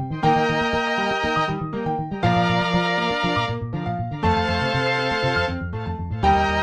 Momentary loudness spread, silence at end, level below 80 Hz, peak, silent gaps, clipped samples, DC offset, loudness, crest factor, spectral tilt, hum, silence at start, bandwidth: 8 LU; 0 s; -38 dBFS; -6 dBFS; none; under 0.1%; under 0.1%; -22 LUFS; 14 dB; -6 dB/octave; none; 0 s; 10 kHz